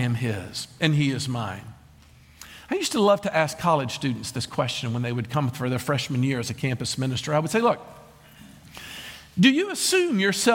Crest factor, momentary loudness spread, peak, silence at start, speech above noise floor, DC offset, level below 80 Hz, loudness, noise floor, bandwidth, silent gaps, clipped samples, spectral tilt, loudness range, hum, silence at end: 22 dB; 14 LU; -2 dBFS; 0 s; 28 dB; under 0.1%; -58 dBFS; -24 LUFS; -52 dBFS; 17 kHz; none; under 0.1%; -4.5 dB/octave; 2 LU; none; 0 s